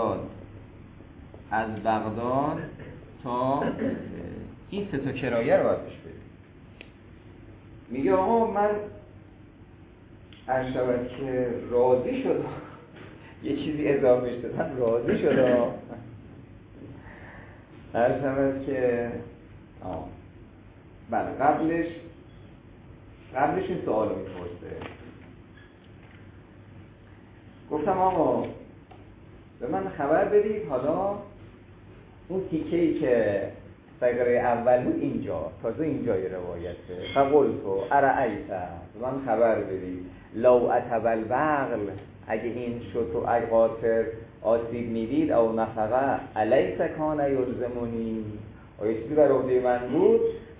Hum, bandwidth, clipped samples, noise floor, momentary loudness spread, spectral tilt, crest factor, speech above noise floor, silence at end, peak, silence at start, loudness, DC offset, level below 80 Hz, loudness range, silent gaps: none; 4 kHz; under 0.1%; -50 dBFS; 21 LU; -11 dB/octave; 20 dB; 24 dB; 0 s; -8 dBFS; 0 s; -26 LUFS; under 0.1%; -52 dBFS; 6 LU; none